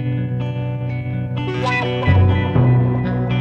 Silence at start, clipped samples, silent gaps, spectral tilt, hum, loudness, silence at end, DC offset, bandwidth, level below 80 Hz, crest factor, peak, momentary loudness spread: 0 s; under 0.1%; none; -8.5 dB/octave; none; -18 LUFS; 0 s; under 0.1%; 6.6 kHz; -36 dBFS; 14 dB; -2 dBFS; 9 LU